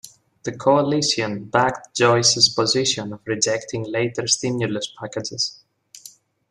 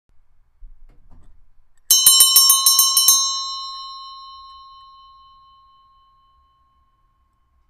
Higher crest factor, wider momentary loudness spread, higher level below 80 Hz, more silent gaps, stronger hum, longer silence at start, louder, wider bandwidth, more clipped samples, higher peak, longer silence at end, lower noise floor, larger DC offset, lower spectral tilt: about the same, 20 dB vs 20 dB; second, 12 LU vs 25 LU; second, -60 dBFS vs -52 dBFS; neither; neither; second, 0.05 s vs 0.65 s; second, -20 LUFS vs -11 LUFS; about the same, 15 kHz vs 15.5 kHz; neither; about the same, -2 dBFS vs 0 dBFS; second, 0.4 s vs 3.4 s; second, -47 dBFS vs -62 dBFS; neither; first, -3 dB/octave vs 4 dB/octave